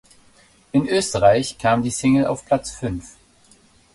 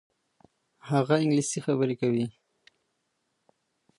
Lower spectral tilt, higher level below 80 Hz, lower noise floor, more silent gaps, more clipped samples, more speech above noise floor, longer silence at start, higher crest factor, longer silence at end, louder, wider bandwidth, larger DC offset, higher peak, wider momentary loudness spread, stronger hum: about the same, -5 dB/octave vs -6 dB/octave; first, -46 dBFS vs -74 dBFS; second, -54 dBFS vs -77 dBFS; neither; neither; second, 35 dB vs 52 dB; about the same, 0.75 s vs 0.85 s; about the same, 18 dB vs 22 dB; second, 0.85 s vs 1.7 s; first, -20 LUFS vs -27 LUFS; about the same, 11.5 kHz vs 11.5 kHz; neither; first, -2 dBFS vs -8 dBFS; first, 12 LU vs 6 LU; neither